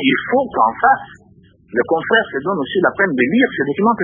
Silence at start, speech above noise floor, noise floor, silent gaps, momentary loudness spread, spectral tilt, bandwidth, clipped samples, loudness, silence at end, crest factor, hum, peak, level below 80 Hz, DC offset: 0 s; 32 dB; -48 dBFS; none; 6 LU; -8.5 dB/octave; 3.7 kHz; under 0.1%; -16 LUFS; 0 s; 16 dB; none; 0 dBFS; -54 dBFS; under 0.1%